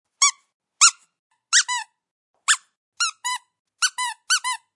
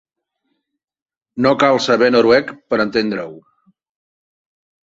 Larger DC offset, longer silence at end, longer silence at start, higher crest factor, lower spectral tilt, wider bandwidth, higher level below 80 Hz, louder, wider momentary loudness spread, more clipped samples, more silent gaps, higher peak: neither; second, 0.2 s vs 1.45 s; second, 0.2 s vs 1.35 s; first, 24 dB vs 18 dB; second, 8.5 dB/octave vs -5 dB/octave; first, 12 kHz vs 7.8 kHz; second, -84 dBFS vs -56 dBFS; second, -20 LUFS vs -15 LUFS; about the same, 13 LU vs 13 LU; neither; first, 0.54-0.60 s, 1.19-1.30 s, 2.11-2.34 s, 2.77-2.92 s, 3.59-3.65 s vs none; about the same, 0 dBFS vs 0 dBFS